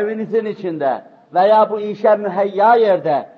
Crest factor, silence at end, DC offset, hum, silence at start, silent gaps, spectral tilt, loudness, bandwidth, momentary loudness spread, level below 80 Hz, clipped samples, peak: 14 dB; 0.1 s; under 0.1%; none; 0 s; none; -8 dB/octave; -16 LUFS; 6 kHz; 9 LU; -76 dBFS; under 0.1%; -2 dBFS